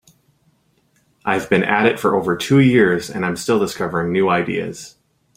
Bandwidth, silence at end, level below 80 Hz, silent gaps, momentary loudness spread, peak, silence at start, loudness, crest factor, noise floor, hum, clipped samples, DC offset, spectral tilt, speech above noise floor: 16 kHz; 0.45 s; -54 dBFS; none; 10 LU; 0 dBFS; 1.25 s; -17 LUFS; 18 dB; -61 dBFS; none; under 0.1%; under 0.1%; -6 dB/octave; 44 dB